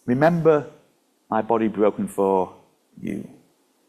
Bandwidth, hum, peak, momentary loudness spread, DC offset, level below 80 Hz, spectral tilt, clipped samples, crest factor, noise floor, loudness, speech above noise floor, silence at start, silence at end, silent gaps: 13.5 kHz; none; -4 dBFS; 15 LU; under 0.1%; -60 dBFS; -8 dB/octave; under 0.1%; 20 dB; -62 dBFS; -22 LUFS; 42 dB; 0.05 s; 0.65 s; none